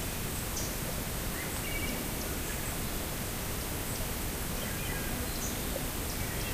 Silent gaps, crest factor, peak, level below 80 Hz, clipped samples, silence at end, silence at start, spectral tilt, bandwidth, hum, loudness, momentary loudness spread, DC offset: none; 14 dB; -20 dBFS; -40 dBFS; under 0.1%; 0 s; 0 s; -3.5 dB/octave; 16 kHz; none; -34 LUFS; 1 LU; under 0.1%